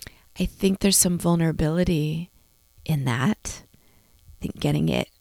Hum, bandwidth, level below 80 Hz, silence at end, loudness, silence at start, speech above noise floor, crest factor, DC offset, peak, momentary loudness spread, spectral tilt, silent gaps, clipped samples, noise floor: none; 17.5 kHz; -42 dBFS; 0.15 s; -23 LUFS; 0.35 s; 34 dB; 18 dB; under 0.1%; -6 dBFS; 18 LU; -4.5 dB/octave; none; under 0.1%; -57 dBFS